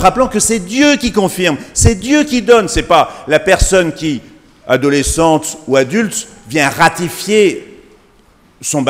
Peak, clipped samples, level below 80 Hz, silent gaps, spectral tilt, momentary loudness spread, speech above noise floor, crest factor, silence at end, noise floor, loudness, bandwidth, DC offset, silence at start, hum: 0 dBFS; 0.3%; -28 dBFS; none; -4 dB/octave; 9 LU; 36 dB; 12 dB; 0 s; -48 dBFS; -12 LUFS; 16.5 kHz; under 0.1%; 0 s; none